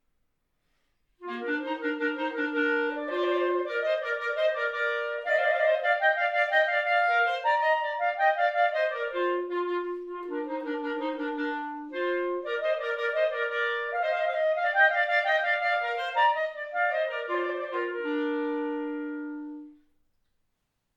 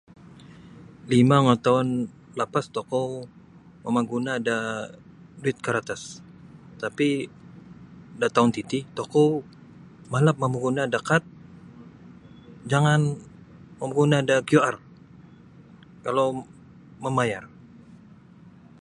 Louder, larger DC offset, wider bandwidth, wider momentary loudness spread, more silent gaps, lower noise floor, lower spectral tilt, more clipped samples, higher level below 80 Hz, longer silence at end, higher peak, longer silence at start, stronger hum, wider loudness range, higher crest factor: second, -27 LUFS vs -24 LUFS; neither; second, 7.8 kHz vs 11.5 kHz; second, 9 LU vs 16 LU; neither; first, -78 dBFS vs -50 dBFS; second, -2.5 dB/octave vs -6 dB/octave; neither; second, -74 dBFS vs -62 dBFS; first, 1.25 s vs 0.85 s; second, -10 dBFS vs -4 dBFS; first, 1.2 s vs 0.45 s; neither; about the same, 7 LU vs 6 LU; about the same, 18 dB vs 22 dB